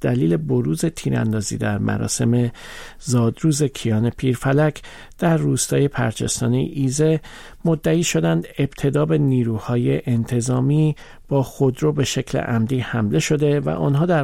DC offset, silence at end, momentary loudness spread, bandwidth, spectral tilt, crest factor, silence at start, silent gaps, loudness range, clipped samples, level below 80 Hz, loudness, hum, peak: under 0.1%; 0 s; 5 LU; 16 kHz; -6 dB/octave; 12 dB; 0 s; none; 1 LU; under 0.1%; -44 dBFS; -20 LUFS; none; -8 dBFS